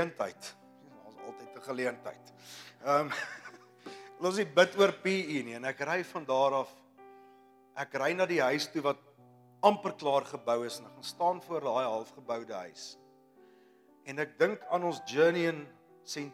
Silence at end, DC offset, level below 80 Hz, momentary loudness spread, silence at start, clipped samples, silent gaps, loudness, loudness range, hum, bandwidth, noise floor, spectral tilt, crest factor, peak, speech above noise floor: 0 s; under 0.1%; under -90 dBFS; 20 LU; 0 s; under 0.1%; none; -32 LUFS; 6 LU; none; 15.5 kHz; -62 dBFS; -4.5 dB/octave; 24 dB; -8 dBFS; 30 dB